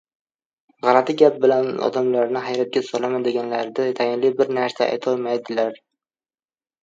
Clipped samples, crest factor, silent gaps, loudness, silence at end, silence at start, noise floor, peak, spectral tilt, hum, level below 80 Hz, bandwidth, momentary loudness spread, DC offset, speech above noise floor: under 0.1%; 20 dB; none; -20 LUFS; 1.05 s; 0.85 s; under -90 dBFS; 0 dBFS; -5.5 dB/octave; none; -74 dBFS; 7.6 kHz; 7 LU; under 0.1%; over 70 dB